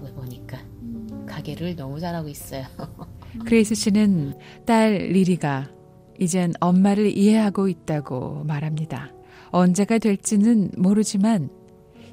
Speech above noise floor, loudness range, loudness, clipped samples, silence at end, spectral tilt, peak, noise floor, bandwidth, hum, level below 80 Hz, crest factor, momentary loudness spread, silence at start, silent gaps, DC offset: 26 dB; 5 LU; -21 LUFS; under 0.1%; 0 s; -6 dB/octave; -6 dBFS; -47 dBFS; 16 kHz; none; -52 dBFS; 16 dB; 18 LU; 0 s; none; under 0.1%